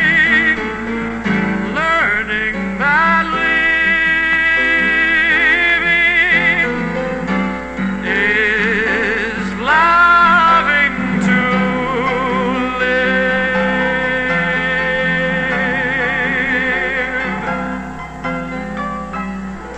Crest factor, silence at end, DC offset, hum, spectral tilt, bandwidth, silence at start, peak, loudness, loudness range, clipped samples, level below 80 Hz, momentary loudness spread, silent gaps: 14 dB; 0 s; 0.6%; none; -5.5 dB/octave; 8.6 kHz; 0 s; -2 dBFS; -14 LUFS; 5 LU; under 0.1%; -38 dBFS; 11 LU; none